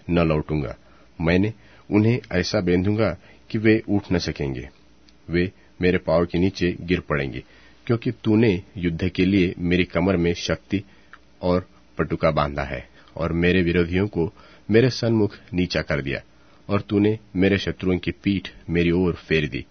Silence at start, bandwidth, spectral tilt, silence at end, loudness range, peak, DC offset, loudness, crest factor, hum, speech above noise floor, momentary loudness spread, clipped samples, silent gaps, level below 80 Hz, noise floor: 0.05 s; 6.6 kHz; -7 dB/octave; 0.1 s; 2 LU; -2 dBFS; 0.2%; -23 LUFS; 20 dB; none; 33 dB; 10 LU; under 0.1%; none; -42 dBFS; -54 dBFS